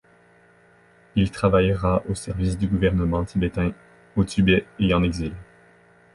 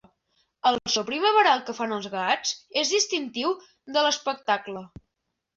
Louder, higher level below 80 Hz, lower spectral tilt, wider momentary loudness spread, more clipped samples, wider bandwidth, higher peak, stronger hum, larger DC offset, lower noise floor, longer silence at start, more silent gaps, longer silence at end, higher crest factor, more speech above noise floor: about the same, -23 LUFS vs -25 LUFS; first, -36 dBFS vs -66 dBFS; first, -7 dB/octave vs -1.5 dB/octave; about the same, 9 LU vs 9 LU; neither; first, 11.5 kHz vs 8 kHz; about the same, -6 dBFS vs -8 dBFS; neither; neither; second, -55 dBFS vs -81 dBFS; first, 1.15 s vs 0.65 s; neither; about the same, 0.7 s vs 0.7 s; about the same, 18 dB vs 20 dB; second, 34 dB vs 56 dB